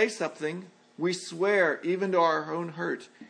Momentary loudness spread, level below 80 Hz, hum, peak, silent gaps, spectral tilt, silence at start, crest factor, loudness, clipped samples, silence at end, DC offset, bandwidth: 10 LU; -86 dBFS; none; -10 dBFS; none; -4.5 dB/octave; 0 s; 18 dB; -28 LUFS; under 0.1%; 0.05 s; under 0.1%; 10.5 kHz